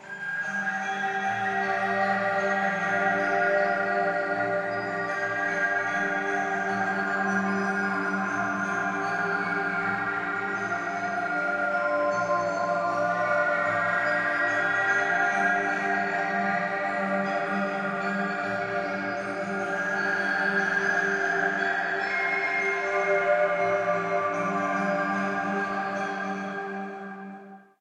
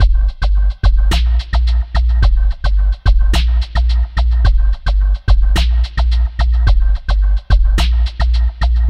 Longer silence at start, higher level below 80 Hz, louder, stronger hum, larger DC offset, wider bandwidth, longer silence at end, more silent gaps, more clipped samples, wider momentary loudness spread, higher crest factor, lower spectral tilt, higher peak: about the same, 0 s vs 0 s; second, -72 dBFS vs -12 dBFS; second, -26 LUFS vs -16 LUFS; neither; neither; first, 11 kHz vs 8.2 kHz; first, 0.2 s vs 0 s; neither; neither; about the same, 5 LU vs 3 LU; about the same, 14 dB vs 12 dB; about the same, -5 dB/octave vs -5.5 dB/octave; second, -12 dBFS vs 0 dBFS